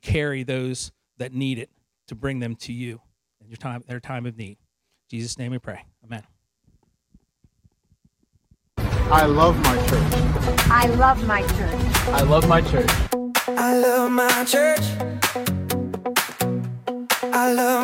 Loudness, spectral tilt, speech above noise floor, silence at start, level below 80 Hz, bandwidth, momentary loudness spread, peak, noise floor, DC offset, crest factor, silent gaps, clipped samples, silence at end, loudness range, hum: -21 LUFS; -4.5 dB/octave; 45 dB; 0.05 s; -32 dBFS; 16.5 kHz; 18 LU; -2 dBFS; -66 dBFS; under 0.1%; 20 dB; none; under 0.1%; 0 s; 17 LU; none